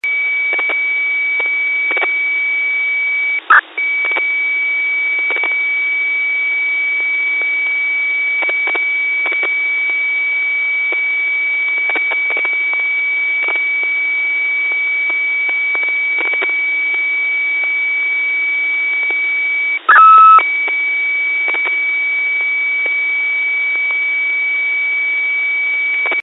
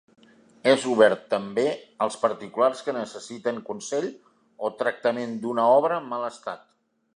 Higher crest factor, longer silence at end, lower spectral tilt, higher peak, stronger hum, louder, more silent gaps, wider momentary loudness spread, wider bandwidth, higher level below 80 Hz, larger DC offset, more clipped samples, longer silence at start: second, 16 dB vs 22 dB; second, 0 s vs 0.6 s; second, -1 dB/octave vs -4 dB/octave; first, 0 dBFS vs -4 dBFS; neither; first, -13 LUFS vs -25 LUFS; neither; second, 0 LU vs 13 LU; second, 4.1 kHz vs 11 kHz; second, under -90 dBFS vs -76 dBFS; neither; neither; second, 0.05 s vs 0.65 s